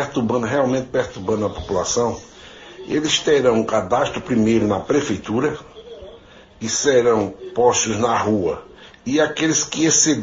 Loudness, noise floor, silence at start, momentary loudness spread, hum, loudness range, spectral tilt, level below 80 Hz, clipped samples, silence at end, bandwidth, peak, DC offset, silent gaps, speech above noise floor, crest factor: -19 LUFS; -44 dBFS; 0 s; 17 LU; none; 2 LU; -3.5 dB/octave; -48 dBFS; under 0.1%; 0 s; 7.8 kHz; -2 dBFS; under 0.1%; none; 26 dB; 18 dB